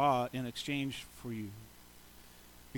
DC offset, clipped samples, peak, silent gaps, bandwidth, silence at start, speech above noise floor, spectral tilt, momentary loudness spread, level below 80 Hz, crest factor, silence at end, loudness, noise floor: under 0.1%; under 0.1%; -18 dBFS; none; 19 kHz; 0 s; 21 dB; -5 dB/octave; 22 LU; -64 dBFS; 20 dB; 0 s; -38 LUFS; -56 dBFS